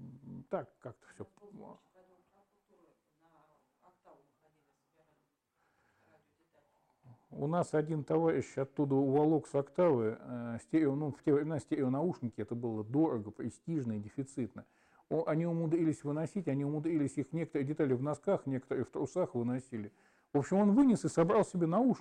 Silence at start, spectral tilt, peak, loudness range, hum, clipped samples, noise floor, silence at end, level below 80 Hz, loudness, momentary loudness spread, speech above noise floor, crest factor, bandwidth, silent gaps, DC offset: 0 s; -8 dB/octave; -20 dBFS; 5 LU; none; under 0.1%; -79 dBFS; 0 s; -74 dBFS; -34 LUFS; 15 LU; 46 dB; 16 dB; 10 kHz; none; under 0.1%